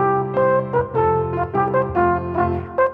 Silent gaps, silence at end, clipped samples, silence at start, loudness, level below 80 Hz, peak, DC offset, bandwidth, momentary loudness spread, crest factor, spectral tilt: none; 0 s; under 0.1%; 0 s; -19 LUFS; -42 dBFS; -6 dBFS; under 0.1%; 4.6 kHz; 3 LU; 14 dB; -10.5 dB/octave